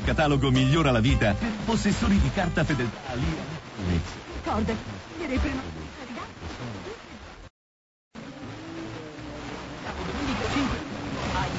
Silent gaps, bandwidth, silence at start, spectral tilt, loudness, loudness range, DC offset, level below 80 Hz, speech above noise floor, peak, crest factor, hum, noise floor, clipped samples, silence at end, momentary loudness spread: 7.50-8.11 s; 8 kHz; 0 s; -6 dB/octave; -27 LUFS; 15 LU; under 0.1%; -38 dBFS; over 66 dB; -12 dBFS; 16 dB; none; under -90 dBFS; under 0.1%; 0 s; 17 LU